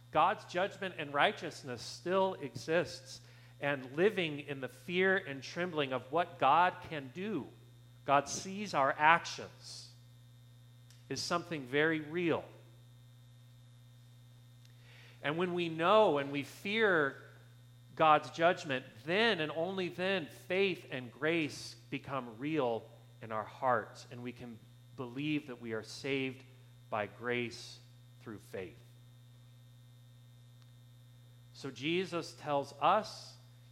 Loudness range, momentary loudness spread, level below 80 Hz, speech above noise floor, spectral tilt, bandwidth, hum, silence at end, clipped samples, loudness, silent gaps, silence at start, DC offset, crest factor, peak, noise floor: 11 LU; 19 LU; -74 dBFS; 24 dB; -4.5 dB/octave; 16.5 kHz; 60 Hz at -60 dBFS; 0.35 s; under 0.1%; -34 LUFS; none; 0.15 s; under 0.1%; 26 dB; -10 dBFS; -58 dBFS